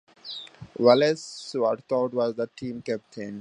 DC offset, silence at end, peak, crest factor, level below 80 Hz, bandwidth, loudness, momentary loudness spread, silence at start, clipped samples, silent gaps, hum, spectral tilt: under 0.1%; 0 s; -4 dBFS; 22 dB; -68 dBFS; 10.5 kHz; -25 LUFS; 18 LU; 0.25 s; under 0.1%; none; none; -5 dB/octave